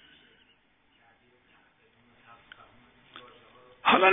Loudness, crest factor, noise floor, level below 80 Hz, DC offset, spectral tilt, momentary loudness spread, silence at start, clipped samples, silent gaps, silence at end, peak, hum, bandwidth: -24 LUFS; 26 dB; -66 dBFS; -70 dBFS; under 0.1%; -6.5 dB/octave; 30 LU; 3.85 s; under 0.1%; none; 0 s; -6 dBFS; none; 3.9 kHz